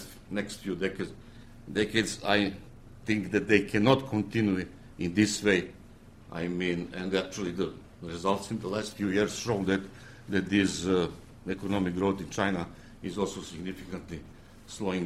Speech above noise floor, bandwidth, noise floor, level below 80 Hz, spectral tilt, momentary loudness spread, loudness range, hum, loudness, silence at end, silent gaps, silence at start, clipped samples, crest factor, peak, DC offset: 22 dB; 14.5 kHz; -51 dBFS; -54 dBFS; -5 dB/octave; 17 LU; 5 LU; none; -30 LUFS; 0 s; none; 0 s; under 0.1%; 22 dB; -8 dBFS; under 0.1%